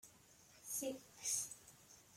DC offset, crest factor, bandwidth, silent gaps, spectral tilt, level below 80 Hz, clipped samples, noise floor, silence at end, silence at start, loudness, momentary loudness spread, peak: under 0.1%; 20 dB; 16.5 kHz; none; -1 dB/octave; -82 dBFS; under 0.1%; -67 dBFS; 0 s; 0.05 s; -43 LUFS; 23 LU; -28 dBFS